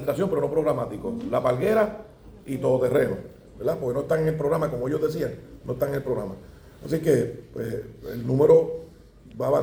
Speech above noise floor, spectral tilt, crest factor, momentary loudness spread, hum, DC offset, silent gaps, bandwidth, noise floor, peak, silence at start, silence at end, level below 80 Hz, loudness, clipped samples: 21 dB; -7.5 dB/octave; 20 dB; 14 LU; none; under 0.1%; none; over 20 kHz; -46 dBFS; -6 dBFS; 0 s; 0 s; -50 dBFS; -25 LUFS; under 0.1%